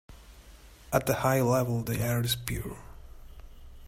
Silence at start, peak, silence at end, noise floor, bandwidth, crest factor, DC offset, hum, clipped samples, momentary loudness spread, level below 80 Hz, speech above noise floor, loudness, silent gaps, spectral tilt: 0.1 s; -8 dBFS; 0 s; -51 dBFS; 16 kHz; 22 dB; under 0.1%; none; under 0.1%; 11 LU; -48 dBFS; 24 dB; -28 LUFS; none; -5 dB/octave